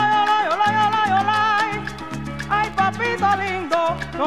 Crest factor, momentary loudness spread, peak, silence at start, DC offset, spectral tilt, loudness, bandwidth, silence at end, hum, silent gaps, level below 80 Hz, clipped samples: 14 dB; 11 LU; -6 dBFS; 0 s; 0.6%; -4.5 dB/octave; -20 LUFS; 13.5 kHz; 0 s; none; none; -46 dBFS; under 0.1%